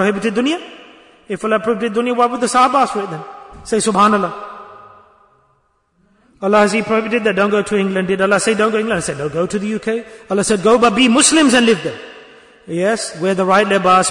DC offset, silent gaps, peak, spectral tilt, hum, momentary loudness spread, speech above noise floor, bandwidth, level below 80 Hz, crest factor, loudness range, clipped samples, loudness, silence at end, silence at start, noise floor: under 0.1%; none; 0 dBFS; -3.5 dB/octave; none; 15 LU; 46 dB; 11 kHz; -52 dBFS; 16 dB; 5 LU; under 0.1%; -15 LUFS; 0 s; 0 s; -60 dBFS